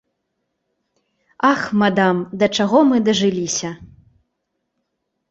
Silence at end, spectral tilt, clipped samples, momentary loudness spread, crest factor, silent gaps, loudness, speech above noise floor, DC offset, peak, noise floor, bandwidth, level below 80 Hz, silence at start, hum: 1.45 s; -4.5 dB/octave; under 0.1%; 9 LU; 18 dB; none; -17 LUFS; 58 dB; under 0.1%; -2 dBFS; -75 dBFS; 8.2 kHz; -58 dBFS; 1.45 s; none